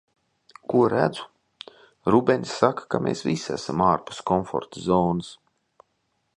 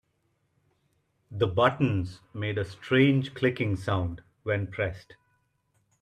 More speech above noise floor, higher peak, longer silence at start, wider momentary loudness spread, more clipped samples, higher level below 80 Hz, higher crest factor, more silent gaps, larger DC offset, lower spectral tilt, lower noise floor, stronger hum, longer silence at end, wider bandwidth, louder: about the same, 50 dB vs 47 dB; first, -2 dBFS vs -8 dBFS; second, 0.7 s vs 1.3 s; first, 21 LU vs 13 LU; neither; about the same, -54 dBFS vs -58 dBFS; about the same, 22 dB vs 22 dB; neither; neither; second, -6 dB/octave vs -7.5 dB/octave; about the same, -73 dBFS vs -73 dBFS; neither; about the same, 1 s vs 1 s; about the same, 10.5 kHz vs 10.5 kHz; first, -24 LUFS vs -27 LUFS